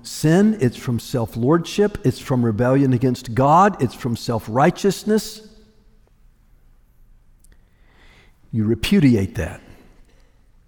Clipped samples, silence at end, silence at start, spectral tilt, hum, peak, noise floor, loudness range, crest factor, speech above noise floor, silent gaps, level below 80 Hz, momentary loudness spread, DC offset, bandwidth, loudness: under 0.1%; 1.1 s; 0.05 s; -6.5 dB/octave; none; -4 dBFS; -53 dBFS; 9 LU; 16 dB; 35 dB; none; -44 dBFS; 10 LU; under 0.1%; over 20 kHz; -19 LUFS